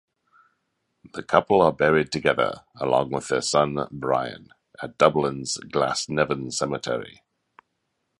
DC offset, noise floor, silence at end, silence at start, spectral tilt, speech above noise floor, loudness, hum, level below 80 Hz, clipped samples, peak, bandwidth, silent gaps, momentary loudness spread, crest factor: under 0.1%; -76 dBFS; 1.1 s; 1.05 s; -4.5 dB/octave; 53 dB; -23 LUFS; none; -56 dBFS; under 0.1%; -2 dBFS; 11.5 kHz; none; 14 LU; 24 dB